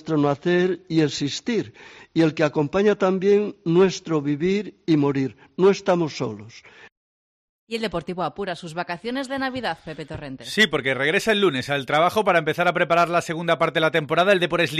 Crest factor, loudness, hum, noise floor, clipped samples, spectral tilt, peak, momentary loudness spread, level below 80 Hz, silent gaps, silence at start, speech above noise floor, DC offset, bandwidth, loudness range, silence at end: 16 dB; -22 LUFS; none; under -90 dBFS; under 0.1%; -5.5 dB/octave; -6 dBFS; 11 LU; -56 dBFS; 6.92-7.67 s; 0.05 s; over 68 dB; under 0.1%; 13 kHz; 9 LU; 0 s